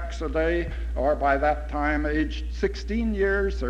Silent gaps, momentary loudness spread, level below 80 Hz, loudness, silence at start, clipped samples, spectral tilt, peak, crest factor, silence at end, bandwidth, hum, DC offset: none; 6 LU; -30 dBFS; -26 LUFS; 0 s; under 0.1%; -7 dB/octave; -10 dBFS; 14 dB; 0 s; 8 kHz; none; under 0.1%